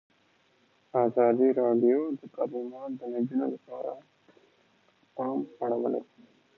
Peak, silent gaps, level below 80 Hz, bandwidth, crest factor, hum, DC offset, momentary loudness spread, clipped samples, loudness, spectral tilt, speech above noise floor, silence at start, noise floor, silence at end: -12 dBFS; none; -84 dBFS; 4.1 kHz; 18 dB; none; under 0.1%; 14 LU; under 0.1%; -29 LUFS; -10 dB/octave; 39 dB; 0.95 s; -67 dBFS; 0.55 s